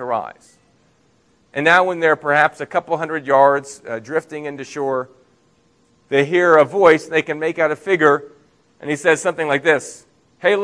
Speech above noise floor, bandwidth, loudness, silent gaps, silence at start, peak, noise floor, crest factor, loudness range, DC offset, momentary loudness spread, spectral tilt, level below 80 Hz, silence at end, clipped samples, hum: 41 dB; 11 kHz; -17 LUFS; none; 0 s; 0 dBFS; -58 dBFS; 18 dB; 4 LU; under 0.1%; 16 LU; -4.5 dB/octave; -68 dBFS; 0 s; under 0.1%; none